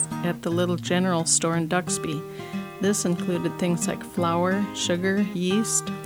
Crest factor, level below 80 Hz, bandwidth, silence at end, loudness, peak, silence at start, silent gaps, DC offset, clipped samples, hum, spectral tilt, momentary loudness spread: 18 dB; -60 dBFS; 19 kHz; 0 s; -24 LUFS; -6 dBFS; 0 s; none; under 0.1%; under 0.1%; none; -4 dB/octave; 7 LU